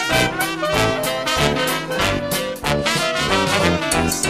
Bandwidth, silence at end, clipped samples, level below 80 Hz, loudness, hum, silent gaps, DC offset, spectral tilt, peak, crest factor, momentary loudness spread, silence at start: 15.5 kHz; 0 s; under 0.1%; -36 dBFS; -18 LUFS; none; none; under 0.1%; -3.5 dB/octave; -2 dBFS; 18 dB; 4 LU; 0 s